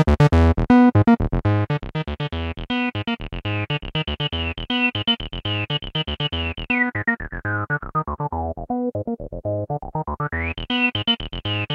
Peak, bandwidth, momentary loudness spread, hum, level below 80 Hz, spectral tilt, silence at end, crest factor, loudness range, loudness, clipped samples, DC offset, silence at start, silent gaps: -2 dBFS; 8 kHz; 12 LU; none; -34 dBFS; -7.5 dB/octave; 0 s; 20 dB; 6 LU; -22 LUFS; under 0.1%; under 0.1%; 0 s; none